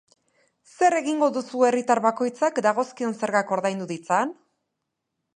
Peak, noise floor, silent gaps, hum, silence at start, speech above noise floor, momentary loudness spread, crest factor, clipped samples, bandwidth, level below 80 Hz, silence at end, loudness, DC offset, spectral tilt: -6 dBFS; -81 dBFS; none; none; 0.8 s; 58 dB; 7 LU; 20 dB; under 0.1%; 10 kHz; -78 dBFS; 1.05 s; -23 LUFS; under 0.1%; -4.5 dB/octave